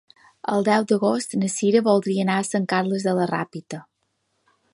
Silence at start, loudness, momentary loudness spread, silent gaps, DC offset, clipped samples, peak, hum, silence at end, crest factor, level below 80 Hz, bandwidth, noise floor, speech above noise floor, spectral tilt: 0.5 s; -22 LUFS; 13 LU; none; under 0.1%; under 0.1%; -6 dBFS; none; 0.9 s; 18 dB; -70 dBFS; 11.5 kHz; -72 dBFS; 51 dB; -5.5 dB/octave